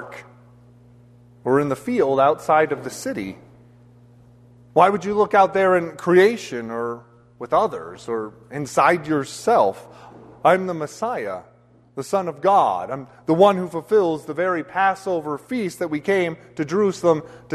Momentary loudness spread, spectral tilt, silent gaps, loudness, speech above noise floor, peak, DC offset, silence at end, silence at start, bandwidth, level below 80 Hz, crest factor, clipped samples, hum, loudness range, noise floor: 14 LU; -5.5 dB/octave; none; -20 LUFS; 30 dB; -2 dBFS; under 0.1%; 0 s; 0 s; 13.5 kHz; -62 dBFS; 20 dB; under 0.1%; 60 Hz at -50 dBFS; 3 LU; -50 dBFS